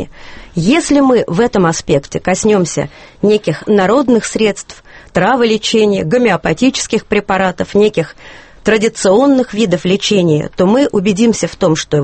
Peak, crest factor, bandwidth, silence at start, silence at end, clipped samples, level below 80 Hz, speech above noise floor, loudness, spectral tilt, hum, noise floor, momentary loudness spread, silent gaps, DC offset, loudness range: 0 dBFS; 12 dB; 8.8 kHz; 0 s; 0 s; under 0.1%; -40 dBFS; 20 dB; -12 LUFS; -5 dB/octave; none; -32 dBFS; 7 LU; none; under 0.1%; 2 LU